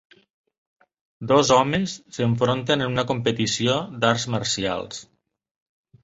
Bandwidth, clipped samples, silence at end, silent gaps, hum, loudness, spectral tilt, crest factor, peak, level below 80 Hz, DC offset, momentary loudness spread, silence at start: 8 kHz; under 0.1%; 1 s; none; none; -22 LUFS; -4.5 dB/octave; 20 dB; -2 dBFS; -54 dBFS; under 0.1%; 11 LU; 1.2 s